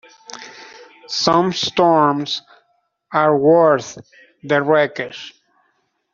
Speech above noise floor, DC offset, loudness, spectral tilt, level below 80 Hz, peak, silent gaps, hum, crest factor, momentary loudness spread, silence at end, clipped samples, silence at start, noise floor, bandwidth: 50 dB; under 0.1%; -16 LUFS; -4.5 dB/octave; -60 dBFS; -2 dBFS; none; none; 16 dB; 22 LU; 0.85 s; under 0.1%; 0.3 s; -66 dBFS; 7.6 kHz